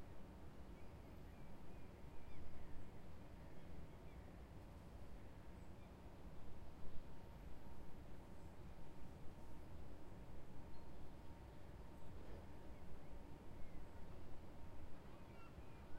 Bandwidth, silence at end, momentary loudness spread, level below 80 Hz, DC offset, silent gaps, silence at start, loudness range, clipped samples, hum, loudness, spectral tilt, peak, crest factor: 15 kHz; 0 s; 1 LU; -60 dBFS; under 0.1%; none; 0 s; 1 LU; under 0.1%; none; -60 LUFS; -7 dB/octave; -32 dBFS; 16 dB